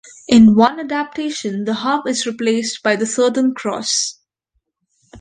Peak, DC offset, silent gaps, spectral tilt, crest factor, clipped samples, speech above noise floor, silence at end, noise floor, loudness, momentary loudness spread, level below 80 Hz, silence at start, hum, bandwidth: 0 dBFS; under 0.1%; none; -4 dB/octave; 16 dB; under 0.1%; 55 dB; 0 s; -71 dBFS; -16 LUFS; 12 LU; -52 dBFS; 0.05 s; none; 9.6 kHz